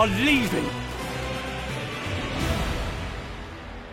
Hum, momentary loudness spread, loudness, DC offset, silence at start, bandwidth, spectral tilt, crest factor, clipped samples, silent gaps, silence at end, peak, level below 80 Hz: none; 16 LU; -27 LUFS; under 0.1%; 0 s; 16.5 kHz; -5 dB/octave; 20 dB; under 0.1%; none; 0 s; -6 dBFS; -38 dBFS